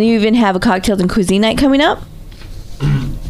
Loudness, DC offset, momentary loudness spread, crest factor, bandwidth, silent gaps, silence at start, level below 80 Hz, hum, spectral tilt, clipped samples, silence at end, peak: -13 LUFS; under 0.1%; 8 LU; 12 dB; 14.5 kHz; none; 0 s; -30 dBFS; none; -5.5 dB/octave; under 0.1%; 0 s; 0 dBFS